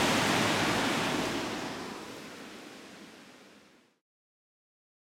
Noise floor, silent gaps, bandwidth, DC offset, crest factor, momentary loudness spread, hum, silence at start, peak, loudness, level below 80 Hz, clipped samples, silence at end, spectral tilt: -60 dBFS; none; 16.5 kHz; under 0.1%; 18 dB; 22 LU; none; 0 s; -16 dBFS; -30 LUFS; -62 dBFS; under 0.1%; 1.55 s; -3.5 dB/octave